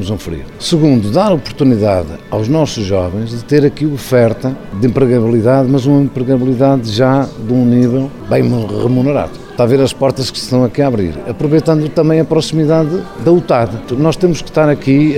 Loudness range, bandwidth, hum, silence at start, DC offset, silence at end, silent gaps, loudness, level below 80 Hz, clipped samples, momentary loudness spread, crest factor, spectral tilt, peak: 2 LU; 15.5 kHz; none; 0 s; under 0.1%; 0 s; none; -13 LUFS; -38 dBFS; under 0.1%; 7 LU; 12 dB; -7 dB/octave; 0 dBFS